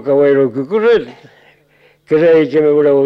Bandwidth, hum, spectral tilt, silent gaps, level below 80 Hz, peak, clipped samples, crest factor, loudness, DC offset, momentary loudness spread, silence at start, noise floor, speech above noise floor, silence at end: 5.8 kHz; none; -8 dB/octave; none; -54 dBFS; -2 dBFS; under 0.1%; 10 dB; -12 LUFS; under 0.1%; 6 LU; 0 s; -51 dBFS; 40 dB; 0 s